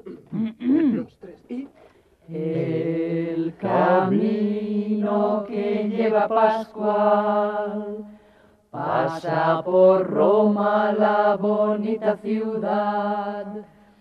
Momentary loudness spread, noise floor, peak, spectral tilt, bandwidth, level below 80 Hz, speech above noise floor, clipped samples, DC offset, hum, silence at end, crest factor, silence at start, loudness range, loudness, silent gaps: 14 LU; -55 dBFS; -6 dBFS; -9 dB/octave; 6.2 kHz; -66 dBFS; 34 dB; under 0.1%; under 0.1%; none; 0.35 s; 16 dB; 0.05 s; 5 LU; -22 LUFS; none